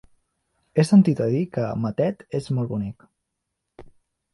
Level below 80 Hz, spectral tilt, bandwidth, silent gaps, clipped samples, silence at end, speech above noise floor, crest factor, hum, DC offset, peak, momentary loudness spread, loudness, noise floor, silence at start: -58 dBFS; -8 dB/octave; 11.5 kHz; none; under 0.1%; 0.5 s; 59 dB; 18 dB; none; under 0.1%; -6 dBFS; 13 LU; -22 LUFS; -80 dBFS; 0.75 s